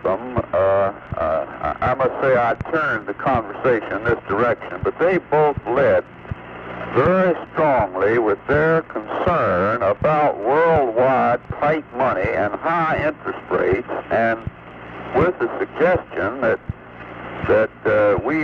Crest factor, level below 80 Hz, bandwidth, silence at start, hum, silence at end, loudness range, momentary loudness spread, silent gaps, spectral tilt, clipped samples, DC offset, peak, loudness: 12 dB; -44 dBFS; 6.6 kHz; 0 s; none; 0 s; 3 LU; 10 LU; none; -8.5 dB/octave; under 0.1%; under 0.1%; -6 dBFS; -19 LUFS